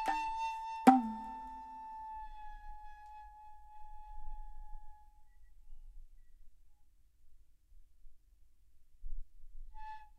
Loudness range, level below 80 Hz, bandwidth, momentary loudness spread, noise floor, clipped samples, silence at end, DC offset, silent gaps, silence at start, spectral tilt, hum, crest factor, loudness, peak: 27 LU; -52 dBFS; 14 kHz; 29 LU; -62 dBFS; under 0.1%; 0 s; under 0.1%; none; 0 s; -5.5 dB/octave; none; 30 dB; -34 LUFS; -8 dBFS